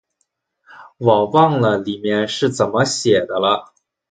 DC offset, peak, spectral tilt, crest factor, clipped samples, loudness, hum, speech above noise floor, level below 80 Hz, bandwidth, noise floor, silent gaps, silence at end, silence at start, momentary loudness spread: under 0.1%; 0 dBFS; -5 dB/octave; 18 dB; under 0.1%; -17 LUFS; none; 54 dB; -56 dBFS; 9.6 kHz; -71 dBFS; none; 0.45 s; 0.75 s; 7 LU